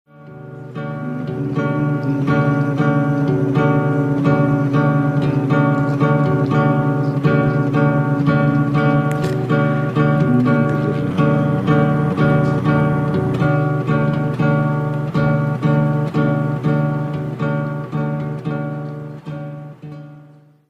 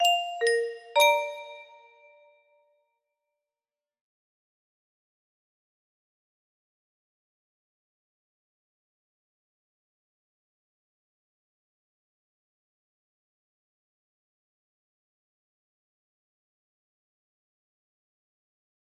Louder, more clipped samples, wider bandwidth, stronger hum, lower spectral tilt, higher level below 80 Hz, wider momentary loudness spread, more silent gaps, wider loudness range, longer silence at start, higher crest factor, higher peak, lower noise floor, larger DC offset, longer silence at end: first, -17 LUFS vs -25 LUFS; neither; second, 6.4 kHz vs 13 kHz; neither; first, -9.5 dB/octave vs 2.5 dB/octave; first, -50 dBFS vs -88 dBFS; second, 10 LU vs 22 LU; neither; second, 4 LU vs 15 LU; first, 0.2 s vs 0 s; second, 14 dB vs 28 dB; first, -2 dBFS vs -8 dBFS; second, -45 dBFS vs under -90 dBFS; neither; second, 0.45 s vs 17.35 s